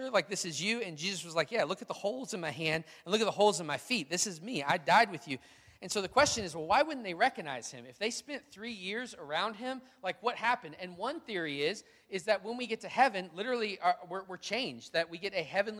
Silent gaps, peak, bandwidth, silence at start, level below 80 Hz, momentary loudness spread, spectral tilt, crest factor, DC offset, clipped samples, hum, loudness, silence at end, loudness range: none; -12 dBFS; 16 kHz; 0 s; -70 dBFS; 13 LU; -3 dB/octave; 22 dB; under 0.1%; under 0.1%; none; -33 LUFS; 0 s; 6 LU